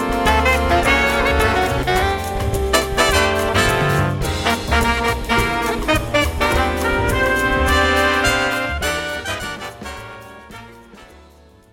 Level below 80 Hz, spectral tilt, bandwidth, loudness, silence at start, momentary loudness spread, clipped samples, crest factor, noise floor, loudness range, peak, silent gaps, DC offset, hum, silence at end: -28 dBFS; -4 dB/octave; 17 kHz; -17 LUFS; 0 s; 14 LU; under 0.1%; 16 dB; -47 dBFS; 4 LU; -2 dBFS; none; under 0.1%; none; 0.65 s